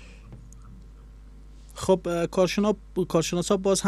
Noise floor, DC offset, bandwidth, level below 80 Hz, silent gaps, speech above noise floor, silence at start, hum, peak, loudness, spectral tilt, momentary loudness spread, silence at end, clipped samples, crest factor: -46 dBFS; under 0.1%; 14 kHz; -46 dBFS; none; 22 dB; 0 s; none; -8 dBFS; -25 LUFS; -5 dB/octave; 24 LU; 0 s; under 0.1%; 18 dB